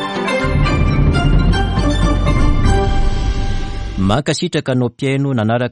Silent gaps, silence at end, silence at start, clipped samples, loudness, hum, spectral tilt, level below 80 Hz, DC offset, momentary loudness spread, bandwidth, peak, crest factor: none; 0 s; 0 s; under 0.1%; -16 LUFS; none; -6.5 dB/octave; -18 dBFS; under 0.1%; 6 LU; 11 kHz; -2 dBFS; 12 dB